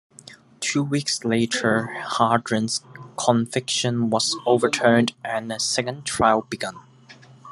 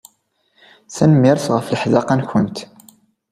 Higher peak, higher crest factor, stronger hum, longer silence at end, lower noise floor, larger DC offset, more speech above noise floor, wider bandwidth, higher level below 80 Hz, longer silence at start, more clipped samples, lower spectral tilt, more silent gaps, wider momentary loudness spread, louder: about the same, -2 dBFS vs 0 dBFS; about the same, 22 dB vs 18 dB; neither; second, 0 s vs 0.65 s; second, -48 dBFS vs -64 dBFS; neither; second, 26 dB vs 48 dB; second, 12.5 kHz vs 15 kHz; second, -60 dBFS vs -54 dBFS; second, 0.25 s vs 0.9 s; neither; second, -4 dB/octave vs -7 dB/octave; neither; second, 9 LU vs 12 LU; second, -22 LUFS vs -16 LUFS